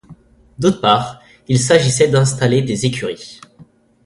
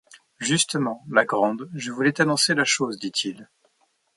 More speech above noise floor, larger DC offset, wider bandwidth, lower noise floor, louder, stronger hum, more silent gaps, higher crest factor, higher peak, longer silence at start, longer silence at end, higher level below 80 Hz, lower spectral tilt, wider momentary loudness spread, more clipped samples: second, 32 dB vs 45 dB; neither; about the same, 11.5 kHz vs 11.5 kHz; second, -47 dBFS vs -68 dBFS; first, -15 LUFS vs -23 LUFS; neither; neither; second, 16 dB vs 22 dB; first, 0 dBFS vs -4 dBFS; about the same, 0.1 s vs 0.15 s; second, 0.45 s vs 0.7 s; first, -48 dBFS vs -70 dBFS; first, -5 dB/octave vs -3 dB/octave; first, 14 LU vs 11 LU; neither